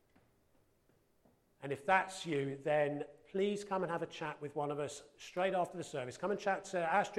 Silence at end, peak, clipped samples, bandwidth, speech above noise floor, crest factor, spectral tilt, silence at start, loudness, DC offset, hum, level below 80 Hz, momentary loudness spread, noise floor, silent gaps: 0 s; -18 dBFS; under 0.1%; 13 kHz; 36 dB; 20 dB; -5 dB/octave; 1.6 s; -37 LUFS; under 0.1%; none; -76 dBFS; 11 LU; -73 dBFS; none